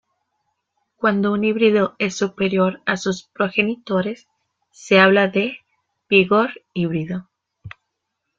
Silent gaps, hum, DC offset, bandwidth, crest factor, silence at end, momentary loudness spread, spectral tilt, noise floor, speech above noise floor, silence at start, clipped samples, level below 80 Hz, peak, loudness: none; none; under 0.1%; 7.6 kHz; 18 dB; 0.7 s; 12 LU; -5.5 dB/octave; -77 dBFS; 59 dB; 1 s; under 0.1%; -60 dBFS; -2 dBFS; -19 LUFS